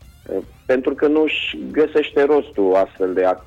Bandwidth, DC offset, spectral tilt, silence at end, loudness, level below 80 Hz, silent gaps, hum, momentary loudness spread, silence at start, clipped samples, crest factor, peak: 7.6 kHz; under 0.1%; -6 dB/octave; 0.05 s; -19 LUFS; -50 dBFS; none; none; 11 LU; 0.3 s; under 0.1%; 12 dB; -8 dBFS